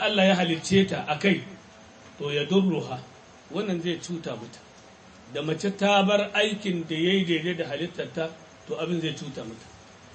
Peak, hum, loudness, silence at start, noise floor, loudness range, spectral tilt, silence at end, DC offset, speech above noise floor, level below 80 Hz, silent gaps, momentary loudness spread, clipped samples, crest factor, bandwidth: -8 dBFS; none; -26 LUFS; 0 s; -50 dBFS; 5 LU; -5 dB/octave; 0 s; under 0.1%; 24 dB; -62 dBFS; none; 16 LU; under 0.1%; 18 dB; 8.8 kHz